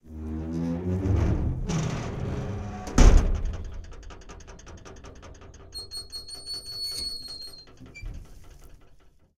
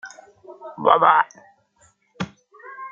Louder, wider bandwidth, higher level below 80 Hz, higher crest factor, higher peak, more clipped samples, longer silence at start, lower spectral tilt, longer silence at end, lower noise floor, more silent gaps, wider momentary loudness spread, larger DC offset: second, -29 LUFS vs -18 LUFS; first, 14 kHz vs 7.8 kHz; first, -30 dBFS vs -66 dBFS; about the same, 24 dB vs 22 dB; about the same, -4 dBFS vs -2 dBFS; neither; about the same, 0.05 s vs 0.05 s; about the same, -5.5 dB/octave vs -5 dB/octave; first, 0.45 s vs 0.05 s; second, -54 dBFS vs -60 dBFS; neither; second, 21 LU vs 26 LU; neither